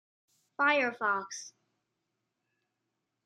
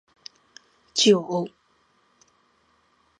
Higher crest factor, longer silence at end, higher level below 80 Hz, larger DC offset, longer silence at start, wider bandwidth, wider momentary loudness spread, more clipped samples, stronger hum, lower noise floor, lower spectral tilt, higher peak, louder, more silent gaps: about the same, 22 dB vs 22 dB; about the same, 1.75 s vs 1.7 s; second, under -90 dBFS vs -76 dBFS; neither; second, 0.6 s vs 0.95 s; about the same, 11 kHz vs 10.5 kHz; second, 21 LU vs 27 LU; neither; neither; first, -84 dBFS vs -65 dBFS; second, -2 dB/octave vs -3.5 dB/octave; second, -14 dBFS vs -4 dBFS; second, -29 LUFS vs -22 LUFS; neither